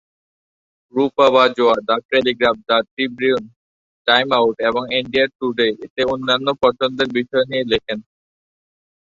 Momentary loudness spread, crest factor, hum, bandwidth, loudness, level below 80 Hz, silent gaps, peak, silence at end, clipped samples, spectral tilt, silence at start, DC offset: 7 LU; 18 dB; none; 7.6 kHz; -17 LUFS; -54 dBFS; 2.05-2.09 s, 2.91-2.97 s, 3.56-4.05 s, 5.35-5.40 s, 5.90-5.96 s; -2 dBFS; 1.1 s; under 0.1%; -5 dB/octave; 0.95 s; under 0.1%